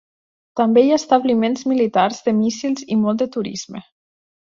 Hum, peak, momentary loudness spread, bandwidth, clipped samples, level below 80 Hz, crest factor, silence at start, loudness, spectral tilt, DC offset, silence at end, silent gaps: none; -2 dBFS; 14 LU; 7.4 kHz; under 0.1%; -62 dBFS; 16 dB; 0.55 s; -18 LUFS; -5.5 dB/octave; under 0.1%; 0.6 s; none